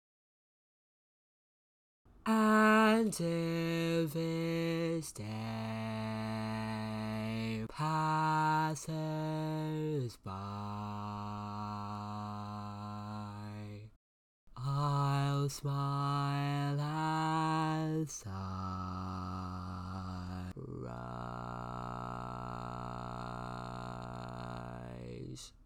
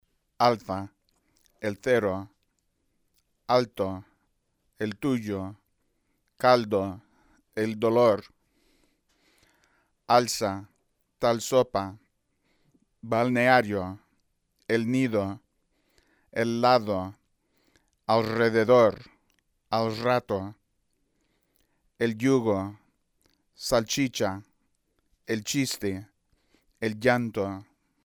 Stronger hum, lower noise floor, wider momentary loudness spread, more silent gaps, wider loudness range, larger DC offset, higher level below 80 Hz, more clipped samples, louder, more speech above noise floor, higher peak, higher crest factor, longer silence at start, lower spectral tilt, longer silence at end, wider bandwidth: neither; first, under -90 dBFS vs -74 dBFS; second, 13 LU vs 17 LU; first, 13.96-14.47 s vs none; first, 11 LU vs 6 LU; neither; about the same, -60 dBFS vs -62 dBFS; neither; second, -36 LUFS vs -26 LUFS; first, over 55 dB vs 49 dB; second, -18 dBFS vs -6 dBFS; second, 18 dB vs 24 dB; first, 2.25 s vs 0.4 s; about the same, -6 dB/octave vs -5 dB/octave; second, 0 s vs 0.4 s; second, 17 kHz vs over 20 kHz